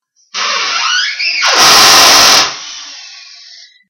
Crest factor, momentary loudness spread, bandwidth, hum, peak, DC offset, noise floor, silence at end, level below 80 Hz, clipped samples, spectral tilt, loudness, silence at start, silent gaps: 10 dB; 21 LU; over 20 kHz; none; 0 dBFS; under 0.1%; -37 dBFS; 0.75 s; -48 dBFS; 2%; 1 dB/octave; -6 LUFS; 0.35 s; none